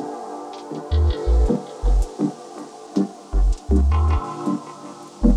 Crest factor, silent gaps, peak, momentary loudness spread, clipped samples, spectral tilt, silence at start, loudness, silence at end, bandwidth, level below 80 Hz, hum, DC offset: 18 dB; none; -4 dBFS; 17 LU; under 0.1%; -8 dB/octave; 0 s; -23 LUFS; 0 s; 10 kHz; -22 dBFS; none; under 0.1%